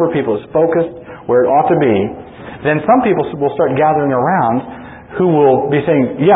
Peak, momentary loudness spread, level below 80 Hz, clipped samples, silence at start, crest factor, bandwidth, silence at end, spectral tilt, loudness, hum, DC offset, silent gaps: 0 dBFS; 12 LU; -48 dBFS; under 0.1%; 0 s; 12 dB; 4 kHz; 0 s; -13 dB/octave; -14 LUFS; none; under 0.1%; none